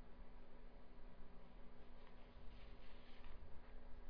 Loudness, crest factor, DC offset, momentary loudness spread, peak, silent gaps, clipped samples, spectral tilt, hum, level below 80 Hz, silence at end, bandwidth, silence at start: -65 LUFS; 10 dB; under 0.1%; 3 LU; -40 dBFS; none; under 0.1%; -5 dB/octave; none; -58 dBFS; 0 s; 5.2 kHz; 0 s